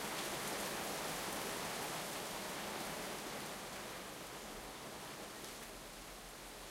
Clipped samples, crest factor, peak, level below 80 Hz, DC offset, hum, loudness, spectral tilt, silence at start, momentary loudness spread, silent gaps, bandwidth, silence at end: under 0.1%; 18 dB; -28 dBFS; -66 dBFS; under 0.1%; none; -44 LUFS; -2 dB/octave; 0 s; 9 LU; none; 16 kHz; 0 s